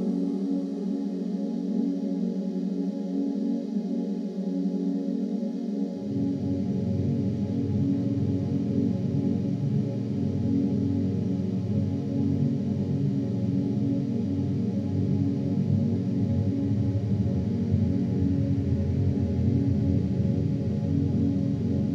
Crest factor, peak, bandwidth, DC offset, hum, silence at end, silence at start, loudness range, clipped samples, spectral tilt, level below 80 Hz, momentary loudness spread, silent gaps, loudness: 14 dB; -12 dBFS; 7.2 kHz; under 0.1%; none; 0 s; 0 s; 3 LU; under 0.1%; -10 dB/octave; -50 dBFS; 4 LU; none; -27 LUFS